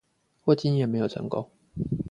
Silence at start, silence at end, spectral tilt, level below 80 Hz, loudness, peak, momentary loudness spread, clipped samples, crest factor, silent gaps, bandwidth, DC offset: 0.45 s; 0 s; -8.5 dB/octave; -54 dBFS; -27 LUFS; -8 dBFS; 11 LU; under 0.1%; 20 dB; none; 9.2 kHz; under 0.1%